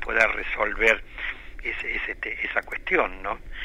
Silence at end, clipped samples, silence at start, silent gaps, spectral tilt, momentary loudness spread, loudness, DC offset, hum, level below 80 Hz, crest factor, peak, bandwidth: 0 s; under 0.1%; 0 s; none; -3.5 dB/octave; 12 LU; -25 LUFS; under 0.1%; none; -40 dBFS; 20 dB; -6 dBFS; 15 kHz